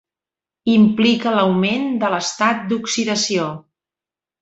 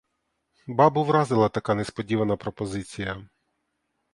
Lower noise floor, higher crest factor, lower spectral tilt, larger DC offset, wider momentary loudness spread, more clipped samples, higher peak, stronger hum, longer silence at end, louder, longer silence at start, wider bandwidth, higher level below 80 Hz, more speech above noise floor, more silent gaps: first, -89 dBFS vs -77 dBFS; second, 16 dB vs 22 dB; second, -4.5 dB/octave vs -7 dB/octave; neither; second, 8 LU vs 12 LU; neither; about the same, -2 dBFS vs -4 dBFS; neither; about the same, 0.8 s vs 0.9 s; first, -17 LUFS vs -25 LUFS; about the same, 0.65 s vs 0.65 s; second, 8.2 kHz vs 11.5 kHz; second, -60 dBFS vs -54 dBFS; first, 72 dB vs 53 dB; neither